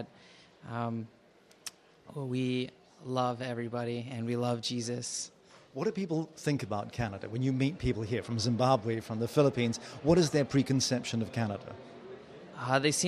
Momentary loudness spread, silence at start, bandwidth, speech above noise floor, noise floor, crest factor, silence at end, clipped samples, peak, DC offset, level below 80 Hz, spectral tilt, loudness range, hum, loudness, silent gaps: 19 LU; 0 s; 14 kHz; 27 dB; -58 dBFS; 20 dB; 0 s; under 0.1%; -12 dBFS; under 0.1%; -58 dBFS; -5 dB/octave; 7 LU; none; -32 LUFS; none